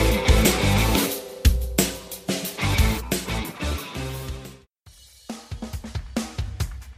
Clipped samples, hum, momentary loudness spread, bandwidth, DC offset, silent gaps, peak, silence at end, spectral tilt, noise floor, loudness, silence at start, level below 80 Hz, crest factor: under 0.1%; none; 17 LU; 16 kHz; under 0.1%; none; -4 dBFS; 0.05 s; -4.5 dB/octave; -51 dBFS; -24 LUFS; 0 s; -28 dBFS; 20 dB